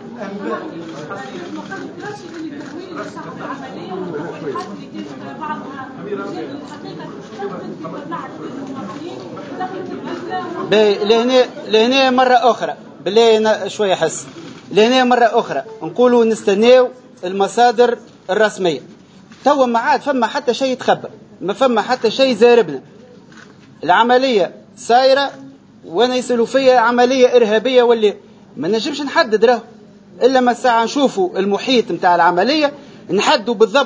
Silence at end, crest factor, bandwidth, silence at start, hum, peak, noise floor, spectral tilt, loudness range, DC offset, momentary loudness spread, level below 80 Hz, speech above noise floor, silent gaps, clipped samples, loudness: 0 s; 16 dB; 8 kHz; 0 s; none; 0 dBFS; -42 dBFS; -4 dB/octave; 14 LU; under 0.1%; 17 LU; -64 dBFS; 26 dB; none; under 0.1%; -15 LUFS